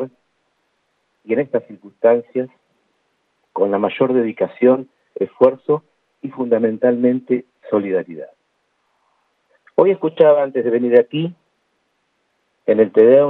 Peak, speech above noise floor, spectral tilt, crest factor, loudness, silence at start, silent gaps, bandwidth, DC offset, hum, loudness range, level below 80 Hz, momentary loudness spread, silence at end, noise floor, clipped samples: 0 dBFS; 52 dB; -10 dB/octave; 18 dB; -17 LUFS; 0 s; none; 4 kHz; under 0.1%; none; 4 LU; -72 dBFS; 14 LU; 0 s; -68 dBFS; under 0.1%